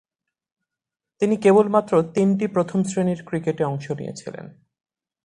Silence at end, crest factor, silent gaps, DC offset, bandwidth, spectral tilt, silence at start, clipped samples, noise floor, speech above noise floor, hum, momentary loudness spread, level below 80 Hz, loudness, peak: 0.75 s; 18 dB; none; under 0.1%; 10.5 kHz; -7 dB/octave; 1.2 s; under 0.1%; -87 dBFS; 66 dB; none; 16 LU; -62 dBFS; -21 LUFS; -4 dBFS